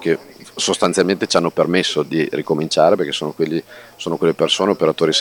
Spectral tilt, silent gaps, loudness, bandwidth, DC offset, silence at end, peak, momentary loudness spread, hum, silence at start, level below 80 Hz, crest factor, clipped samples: -4 dB/octave; none; -18 LUFS; 18.5 kHz; under 0.1%; 0 s; 0 dBFS; 7 LU; none; 0 s; -60 dBFS; 18 dB; under 0.1%